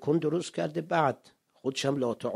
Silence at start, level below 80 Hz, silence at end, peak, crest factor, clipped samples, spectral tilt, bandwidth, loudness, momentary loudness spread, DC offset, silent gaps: 0 s; -72 dBFS; 0 s; -10 dBFS; 20 dB; under 0.1%; -5.5 dB/octave; 14 kHz; -30 LUFS; 7 LU; under 0.1%; none